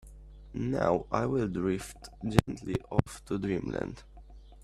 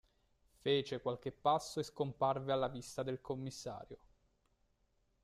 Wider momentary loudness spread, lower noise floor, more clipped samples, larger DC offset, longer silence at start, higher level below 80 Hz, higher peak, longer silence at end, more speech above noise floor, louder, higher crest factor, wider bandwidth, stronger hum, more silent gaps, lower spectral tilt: about the same, 11 LU vs 12 LU; second, -50 dBFS vs -78 dBFS; neither; neither; second, 0.05 s vs 0.65 s; first, -48 dBFS vs -70 dBFS; first, 0 dBFS vs -20 dBFS; second, 0 s vs 1.25 s; second, 20 dB vs 39 dB; first, -32 LUFS vs -39 LUFS; first, 32 dB vs 20 dB; about the same, 14 kHz vs 14 kHz; neither; neither; first, -7 dB/octave vs -5 dB/octave